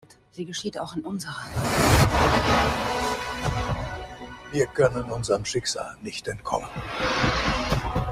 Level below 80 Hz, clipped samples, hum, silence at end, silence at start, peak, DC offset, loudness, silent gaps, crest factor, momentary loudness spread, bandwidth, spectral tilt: -36 dBFS; under 0.1%; none; 0 s; 0.35 s; -6 dBFS; under 0.1%; -25 LUFS; none; 20 dB; 13 LU; 16 kHz; -4.5 dB/octave